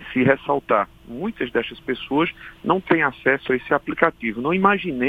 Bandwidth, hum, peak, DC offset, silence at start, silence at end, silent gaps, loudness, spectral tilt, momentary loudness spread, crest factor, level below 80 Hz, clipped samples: 4.9 kHz; none; 0 dBFS; under 0.1%; 0 s; 0 s; none; -21 LUFS; -8 dB/octave; 10 LU; 22 dB; -52 dBFS; under 0.1%